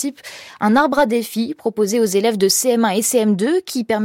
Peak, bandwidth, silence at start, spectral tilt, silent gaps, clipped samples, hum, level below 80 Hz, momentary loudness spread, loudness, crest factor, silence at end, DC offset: -4 dBFS; 17 kHz; 0 s; -3.5 dB/octave; none; under 0.1%; none; -58 dBFS; 8 LU; -17 LUFS; 14 dB; 0 s; under 0.1%